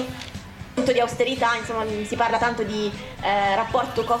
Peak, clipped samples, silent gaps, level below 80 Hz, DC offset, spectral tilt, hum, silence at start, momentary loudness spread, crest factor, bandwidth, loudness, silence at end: -8 dBFS; under 0.1%; none; -46 dBFS; under 0.1%; -4.5 dB/octave; none; 0 s; 11 LU; 16 dB; 16.5 kHz; -23 LUFS; 0 s